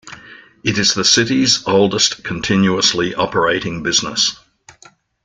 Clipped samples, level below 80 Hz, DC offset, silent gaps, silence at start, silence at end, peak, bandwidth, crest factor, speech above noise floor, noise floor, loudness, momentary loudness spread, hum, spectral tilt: under 0.1%; -48 dBFS; under 0.1%; none; 0.05 s; 0.9 s; 0 dBFS; 11 kHz; 16 dB; 33 dB; -48 dBFS; -15 LUFS; 7 LU; none; -3 dB/octave